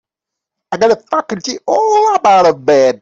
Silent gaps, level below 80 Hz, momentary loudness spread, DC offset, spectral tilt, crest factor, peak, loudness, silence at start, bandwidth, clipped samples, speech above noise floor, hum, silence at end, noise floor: none; -56 dBFS; 10 LU; under 0.1%; -4 dB/octave; 10 dB; -2 dBFS; -12 LUFS; 0.7 s; 7.8 kHz; under 0.1%; 71 dB; none; 0.05 s; -82 dBFS